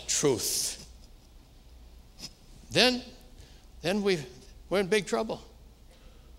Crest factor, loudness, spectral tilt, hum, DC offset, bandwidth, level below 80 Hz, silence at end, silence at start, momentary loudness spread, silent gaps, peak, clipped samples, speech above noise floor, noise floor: 26 dB; -28 LUFS; -2.5 dB/octave; none; under 0.1%; 16 kHz; -52 dBFS; 0 s; 0 s; 21 LU; none; -6 dBFS; under 0.1%; 26 dB; -54 dBFS